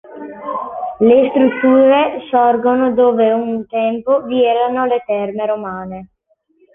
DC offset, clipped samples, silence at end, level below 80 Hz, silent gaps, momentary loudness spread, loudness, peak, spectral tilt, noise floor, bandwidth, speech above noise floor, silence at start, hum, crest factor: under 0.1%; under 0.1%; 0.7 s; -56 dBFS; none; 14 LU; -14 LUFS; -2 dBFS; -9 dB/octave; -60 dBFS; 3.8 kHz; 47 dB; 0.1 s; none; 14 dB